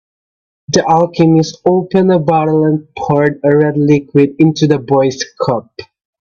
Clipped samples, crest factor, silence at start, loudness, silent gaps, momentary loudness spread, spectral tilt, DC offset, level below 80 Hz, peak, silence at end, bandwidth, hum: under 0.1%; 12 dB; 0.7 s; -12 LUFS; none; 6 LU; -6.5 dB/octave; under 0.1%; -50 dBFS; 0 dBFS; 0.35 s; 7.2 kHz; none